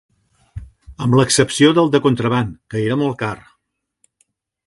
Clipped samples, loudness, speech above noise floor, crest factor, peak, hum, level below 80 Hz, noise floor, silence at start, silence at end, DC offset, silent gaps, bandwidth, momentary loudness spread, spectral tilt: under 0.1%; -16 LUFS; 57 dB; 18 dB; 0 dBFS; none; -46 dBFS; -73 dBFS; 0.55 s; 1.3 s; under 0.1%; none; 11.5 kHz; 24 LU; -5 dB/octave